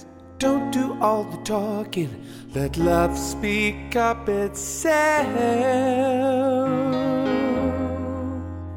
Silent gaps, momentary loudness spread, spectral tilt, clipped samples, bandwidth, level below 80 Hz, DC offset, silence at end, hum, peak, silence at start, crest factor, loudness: none; 8 LU; -5 dB/octave; under 0.1%; 16.5 kHz; -42 dBFS; under 0.1%; 0 s; none; -6 dBFS; 0 s; 16 dB; -23 LUFS